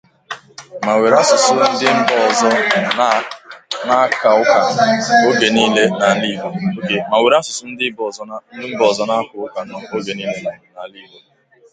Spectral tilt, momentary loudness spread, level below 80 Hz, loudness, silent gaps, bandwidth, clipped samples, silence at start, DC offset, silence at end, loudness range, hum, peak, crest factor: -3.5 dB/octave; 18 LU; -62 dBFS; -15 LUFS; none; 9.6 kHz; under 0.1%; 0.3 s; under 0.1%; 0.7 s; 7 LU; none; 0 dBFS; 16 dB